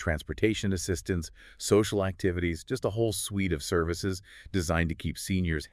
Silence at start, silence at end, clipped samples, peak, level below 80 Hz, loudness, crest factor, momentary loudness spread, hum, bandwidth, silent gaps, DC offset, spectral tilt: 0 s; 0.05 s; under 0.1%; -10 dBFS; -46 dBFS; -30 LUFS; 18 dB; 8 LU; none; 15.5 kHz; none; under 0.1%; -5 dB/octave